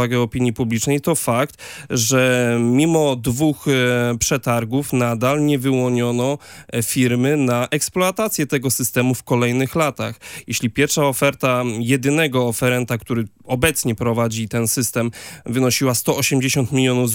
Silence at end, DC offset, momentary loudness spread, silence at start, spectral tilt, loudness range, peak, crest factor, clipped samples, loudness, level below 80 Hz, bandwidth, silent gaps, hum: 0 s; under 0.1%; 7 LU; 0 s; -4.5 dB/octave; 2 LU; 0 dBFS; 18 dB; under 0.1%; -18 LUFS; -48 dBFS; 17 kHz; none; none